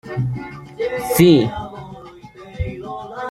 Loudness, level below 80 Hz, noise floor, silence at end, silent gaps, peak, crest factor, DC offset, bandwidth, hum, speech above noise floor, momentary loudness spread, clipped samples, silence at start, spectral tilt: -18 LUFS; -40 dBFS; -39 dBFS; 0 s; none; -2 dBFS; 18 dB; under 0.1%; 16 kHz; none; 23 dB; 25 LU; under 0.1%; 0.05 s; -6 dB/octave